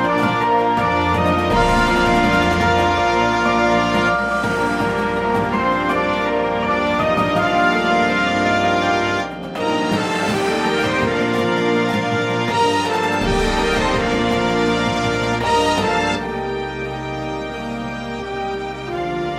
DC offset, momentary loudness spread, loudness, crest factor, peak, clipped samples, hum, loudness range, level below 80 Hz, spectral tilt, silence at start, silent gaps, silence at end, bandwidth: under 0.1%; 9 LU; -18 LUFS; 16 dB; -2 dBFS; under 0.1%; none; 4 LU; -36 dBFS; -5 dB/octave; 0 s; none; 0 s; 16 kHz